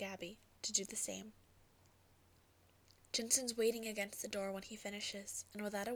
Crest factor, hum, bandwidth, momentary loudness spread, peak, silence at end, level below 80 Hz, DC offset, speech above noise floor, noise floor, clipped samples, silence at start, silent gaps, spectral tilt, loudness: 24 dB; none; over 20 kHz; 12 LU; -20 dBFS; 0 s; -74 dBFS; under 0.1%; 28 dB; -70 dBFS; under 0.1%; 0 s; none; -1.5 dB/octave; -40 LUFS